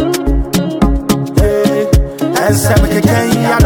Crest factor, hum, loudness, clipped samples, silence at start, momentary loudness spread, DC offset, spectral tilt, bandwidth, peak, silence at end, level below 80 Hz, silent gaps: 10 dB; none; -12 LUFS; under 0.1%; 0 s; 4 LU; under 0.1%; -6 dB/octave; 19.5 kHz; 0 dBFS; 0 s; -18 dBFS; none